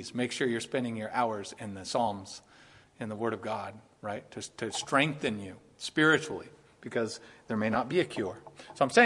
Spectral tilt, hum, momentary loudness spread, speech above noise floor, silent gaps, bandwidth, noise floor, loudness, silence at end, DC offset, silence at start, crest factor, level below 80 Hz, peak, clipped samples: -4.5 dB/octave; none; 17 LU; 26 dB; none; 11.5 kHz; -58 dBFS; -32 LUFS; 0 s; under 0.1%; 0 s; 24 dB; -70 dBFS; -8 dBFS; under 0.1%